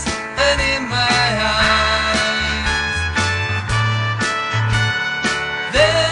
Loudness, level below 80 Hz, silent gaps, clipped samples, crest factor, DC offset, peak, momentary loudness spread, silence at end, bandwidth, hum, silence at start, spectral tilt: -17 LUFS; -32 dBFS; none; under 0.1%; 16 dB; under 0.1%; -2 dBFS; 5 LU; 0 s; 10.5 kHz; none; 0 s; -3.5 dB/octave